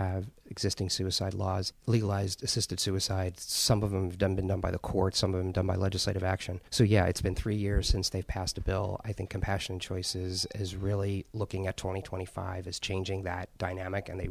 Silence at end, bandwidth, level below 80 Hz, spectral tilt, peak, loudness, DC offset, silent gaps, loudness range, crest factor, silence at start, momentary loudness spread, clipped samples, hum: 0 s; 15.5 kHz; -42 dBFS; -4.5 dB/octave; -10 dBFS; -32 LUFS; under 0.1%; none; 5 LU; 20 dB; 0 s; 8 LU; under 0.1%; none